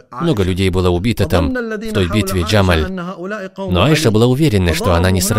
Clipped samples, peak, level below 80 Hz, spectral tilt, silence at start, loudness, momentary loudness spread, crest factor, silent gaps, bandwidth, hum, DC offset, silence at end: under 0.1%; 0 dBFS; -30 dBFS; -5.5 dB/octave; 0.1 s; -15 LUFS; 10 LU; 14 dB; none; 16 kHz; none; under 0.1%; 0 s